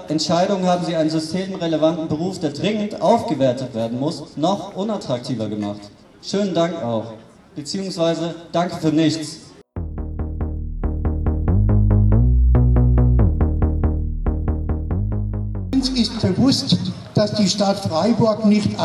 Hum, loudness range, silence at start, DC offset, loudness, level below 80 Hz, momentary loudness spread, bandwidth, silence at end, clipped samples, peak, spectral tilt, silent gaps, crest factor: none; 6 LU; 0 s; under 0.1%; -20 LUFS; -24 dBFS; 11 LU; 12 kHz; 0 s; under 0.1%; -4 dBFS; -6.5 dB/octave; none; 16 dB